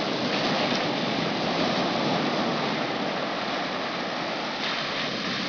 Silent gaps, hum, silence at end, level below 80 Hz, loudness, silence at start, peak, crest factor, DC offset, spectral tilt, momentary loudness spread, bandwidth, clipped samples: none; none; 0 s; -64 dBFS; -26 LUFS; 0 s; -12 dBFS; 16 dB; under 0.1%; -4.5 dB/octave; 4 LU; 5.4 kHz; under 0.1%